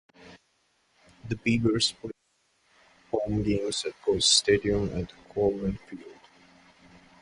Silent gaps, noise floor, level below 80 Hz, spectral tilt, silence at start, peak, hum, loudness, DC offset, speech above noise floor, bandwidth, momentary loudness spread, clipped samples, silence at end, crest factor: none; -71 dBFS; -50 dBFS; -3.5 dB/octave; 0.2 s; -6 dBFS; none; -26 LUFS; under 0.1%; 44 dB; 11.5 kHz; 21 LU; under 0.1%; 1.1 s; 22 dB